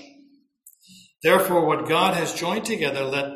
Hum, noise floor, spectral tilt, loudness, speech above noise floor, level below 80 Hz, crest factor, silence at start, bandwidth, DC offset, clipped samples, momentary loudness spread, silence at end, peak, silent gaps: none; -56 dBFS; -4 dB/octave; -22 LUFS; 35 dB; -64 dBFS; 18 dB; 0.65 s; 16 kHz; under 0.1%; under 0.1%; 7 LU; 0 s; -4 dBFS; none